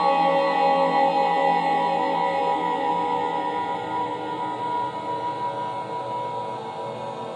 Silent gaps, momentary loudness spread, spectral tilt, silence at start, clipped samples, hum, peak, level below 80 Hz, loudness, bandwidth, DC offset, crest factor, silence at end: none; 10 LU; -5.5 dB/octave; 0 s; under 0.1%; none; -8 dBFS; -72 dBFS; -24 LUFS; 10 kHz; under 0.1%; 14 dB; 0 s